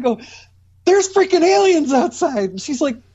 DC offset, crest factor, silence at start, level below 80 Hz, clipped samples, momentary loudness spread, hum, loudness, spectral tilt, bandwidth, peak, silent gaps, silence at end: under 0.1%; 14 dB; 0 s; -58 dBFS; under 0.1%; 9 LU; none; -16 LUFS; -3.5 dB/octave; 8.2 kHz; -4 dBFS; none; 0.15 s